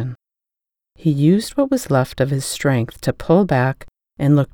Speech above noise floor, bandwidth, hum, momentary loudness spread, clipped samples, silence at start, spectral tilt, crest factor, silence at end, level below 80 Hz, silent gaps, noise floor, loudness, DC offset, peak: 70 dB; 19 kHz; none; 8 LU; under 0.1%; 0 s; -6.5 dB/octave; 16 dB; 0.1 s; -46 dBFS; none; -87 dBFS; -18 LUFS; under 0.1%; -2 dBFS